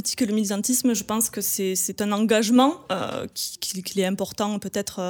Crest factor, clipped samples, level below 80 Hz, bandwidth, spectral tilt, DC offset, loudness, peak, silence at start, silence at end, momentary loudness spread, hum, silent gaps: 18 dB; under 0.1%; -62 dBFS; over 20 kHz; -3.5 dB/octave; under 0.1%; -23 LUFS; -6 dBFS; 0 s; 0 s; 10 LU; none; none